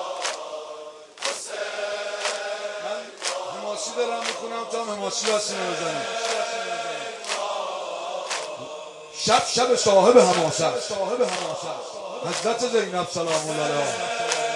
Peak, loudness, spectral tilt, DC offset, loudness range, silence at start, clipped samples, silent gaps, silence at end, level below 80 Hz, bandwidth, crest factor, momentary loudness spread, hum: -2 dBFS; -24 LUFS; -2.5 dB/octave; under 0.1%; 8 LU; 0 s; under 0.1%; none; 0 s; -72 dBFS; 11.5 kHz; 24 dB; 12 LU; none